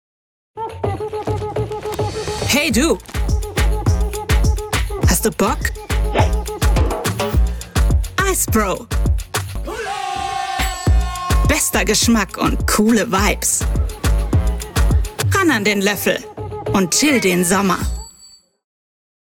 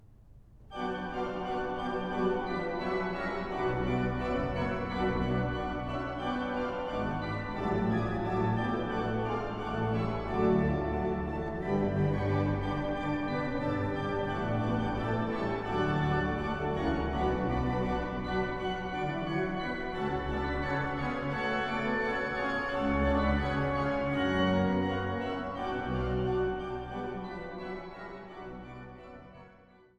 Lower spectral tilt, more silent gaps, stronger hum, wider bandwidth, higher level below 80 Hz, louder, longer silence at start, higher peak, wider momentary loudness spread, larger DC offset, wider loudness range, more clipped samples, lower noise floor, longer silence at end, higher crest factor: second, -4 dB/octave vs -8 dB/octave; neither; neither; first, over 20 kHz vs 9.4 kHz; first, -22 dBFS vs -44 dBFS; first, -18 LUFS vs -32 LUFS; first, 0.55 s vs 0 s; first, -2 dBFS vs -16 dBFS; about the same, 9 LU vs 8 LU; neither; about the same, 4 LU vs 4 LU; neither; second, -47 dBFS vs -58 dBFS; first, 1 s vs 0.4 s; about the same, 16 dB vs 16 dB